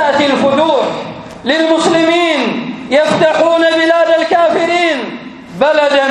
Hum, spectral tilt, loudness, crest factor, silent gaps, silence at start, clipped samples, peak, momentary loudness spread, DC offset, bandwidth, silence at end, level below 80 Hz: none; -4 dB/octave; -11 LUFS; 12 dB; none; 0 s; under 0.1%; 0 dBFS; 11 LU; under 0.1%; 11 kHz; 0 s; -52 dBFS